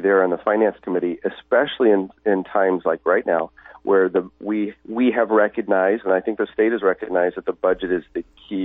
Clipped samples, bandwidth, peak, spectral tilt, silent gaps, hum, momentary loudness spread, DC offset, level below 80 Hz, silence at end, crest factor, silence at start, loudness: under 0.1%; 4 kHz; -6 dBFS; -9.5 dB/octave; none; none; 7 LU; under 0.1%; -58 dBFS; 0 s; 14 dB; 0 s; -20 LUFS